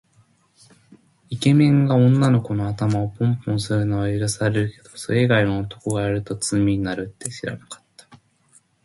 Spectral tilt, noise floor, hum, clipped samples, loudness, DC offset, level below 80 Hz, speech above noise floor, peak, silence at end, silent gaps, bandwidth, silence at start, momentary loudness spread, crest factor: -6.5 dB/octave; -59 dBFS; none; under 0.1%; -21 LUFS; under 0.1%; -48 dBFS; 39 dB; -4 dBFS; 0.7 s; none; 11.5 kHz; 1.3 s; 15 LU; 16 dB